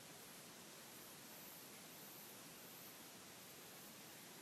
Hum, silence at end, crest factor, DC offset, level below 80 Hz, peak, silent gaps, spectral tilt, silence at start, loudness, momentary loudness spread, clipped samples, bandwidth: none; 0 s; 12 dB; under 0.1%; under -90 dBFS; -46 dBFS; none; -2 dB/octave; 0 s; -56 LUFS; 1 LU; under 0.1%; 15.5 kHz